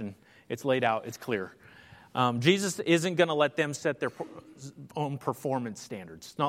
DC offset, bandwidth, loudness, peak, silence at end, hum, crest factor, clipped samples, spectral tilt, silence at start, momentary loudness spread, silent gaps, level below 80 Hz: under 0.1%; 16 kHz; -29 LUFS; -8 dBFS; 0 s; none; 22 dB; under 0.1%; -5 dB/octave; 0 s; 17 LU; none; -72 dBFS